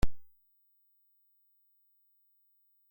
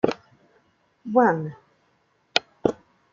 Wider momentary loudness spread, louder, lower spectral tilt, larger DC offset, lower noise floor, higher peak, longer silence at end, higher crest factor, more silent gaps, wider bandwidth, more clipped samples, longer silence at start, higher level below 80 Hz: second, 0 LU vs 20 LU; second, -41 LUFS vs -24 LUFS; about the same, -6 dB/octave vs -5 dB/octave; neither; first, -71 dBFS vs -66 dBFS; second, -14 dBFS vs -2 dBFS; second, 0 s vs 0.4 s; about the same, 20 dB vs 24 dB; neither; first, 16.5 kHz vs 7.4 kHz; neither; about the same, 0 s vs 0.05 s; first, -46 dBFS vs -64 dBFS